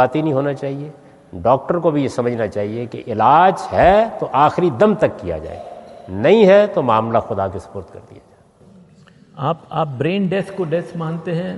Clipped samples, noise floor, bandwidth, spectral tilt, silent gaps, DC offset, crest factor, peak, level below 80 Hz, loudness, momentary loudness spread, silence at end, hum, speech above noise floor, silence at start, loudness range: under 0.1%; -47 dBFS; 11.5 kHz; -7.5 dB/octave; none; under 0.1%; 16 dB; 0 dBFS; -46 dBFS; -17 LUFS; 18 LU; 0 s; none; 31 dB; 0 s; 8 LU